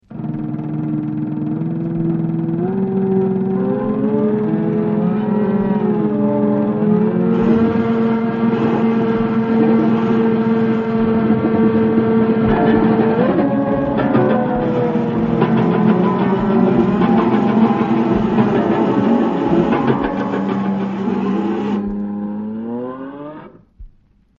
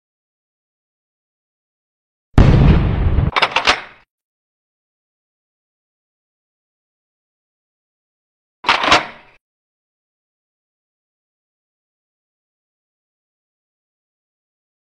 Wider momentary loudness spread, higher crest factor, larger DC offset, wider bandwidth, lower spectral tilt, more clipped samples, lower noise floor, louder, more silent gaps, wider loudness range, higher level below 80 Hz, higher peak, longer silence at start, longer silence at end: about the same, 7 LU vs 9 LU; about the same, 16 dB vs 20 dB; neither; second, 5.4 kHz vs 10 kHz; first, -8 dB/octave vs -5.5 dB/octave; neither; second, -51 dBFS vs under -90 dBFS; about the same, -16 LUFS vs -14 LUFS; second, none vs 4.10-8.63 s; about the same, 5 LU vs 6 LU; second, -42 dBFS vs -26 dBFS; about the same, 0 dBFS vs 0 dBFS; second, 0.1 s vs 2.35 s; second, 0.5 s vs 5.75 s